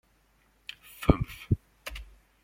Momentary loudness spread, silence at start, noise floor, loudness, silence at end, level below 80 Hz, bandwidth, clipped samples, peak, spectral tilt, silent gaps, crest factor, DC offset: 19 LU; 1 s; -66 dBFS; -31 LUFS; 0.4 s; -40 dBFS; 16.5 kHz; under 0.1%; -2 dBFS; -7 dB/octave; none; 30 dB; under 0.1%